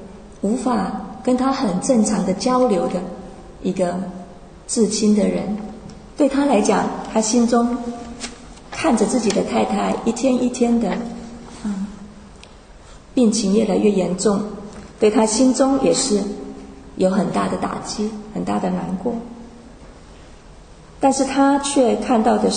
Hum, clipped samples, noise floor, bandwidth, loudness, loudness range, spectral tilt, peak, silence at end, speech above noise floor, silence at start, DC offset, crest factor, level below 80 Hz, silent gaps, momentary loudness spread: none; under 0.1%; -42 dBFS; 9.6 kHz; -19 LUFS; 5 LU; -5 dB/octave; -2 dBFS; 0 s; 24 dB; 0 s; under 0.1%; 18 dB; -46 dBFS; none; 17 LU